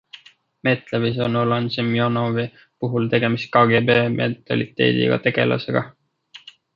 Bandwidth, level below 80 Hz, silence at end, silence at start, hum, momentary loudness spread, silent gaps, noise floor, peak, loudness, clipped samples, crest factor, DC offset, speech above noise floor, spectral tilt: 7 kHz; -58 dBFS; 0.4 s; 0.15 s; none; 9 LU; none; -48 dBFS; -2 dBFS; -20 LUFS; under 0.1%; 18 dB; under 0.1%; 28 dB; -8 dB/octave